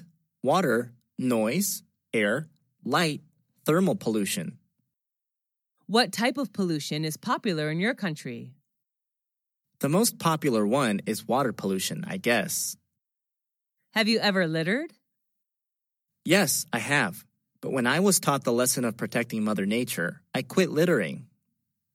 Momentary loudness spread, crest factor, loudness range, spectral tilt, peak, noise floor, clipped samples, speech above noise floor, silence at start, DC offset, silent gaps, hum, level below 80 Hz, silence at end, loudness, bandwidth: 10 LU; 22 dB; 4 LU; -4 dB/octave; -6 dBFS; -87 dBFS; under 0.1%; 61 dB; 0 s; under 0.1%; none; none; -80 dBFS; 0.7 s; -26 LUFS; 16.5 kHz